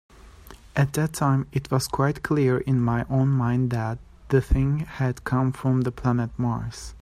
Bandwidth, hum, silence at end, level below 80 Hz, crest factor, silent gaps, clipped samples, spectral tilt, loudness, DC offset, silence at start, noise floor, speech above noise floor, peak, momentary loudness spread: 14.5 kHz; none; 0.05 s; -38 dBFS; 16 dB; none; under 0.1%; -7 dB/octave; -24 LUFS; under 0.1%; 0.25 s; -46 dBFS; 23 dB; -8 dBFS; 5 LU